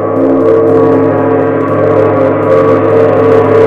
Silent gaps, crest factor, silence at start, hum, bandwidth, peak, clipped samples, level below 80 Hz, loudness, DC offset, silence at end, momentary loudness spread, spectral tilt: none; 8 dB; 0 s; none; 5.4 kHz; 0 dBFS; 0.8%; -42 dBFS; -8 LUFS; under 0.1%; 0 s; 3 LU; -9.5 dB/octave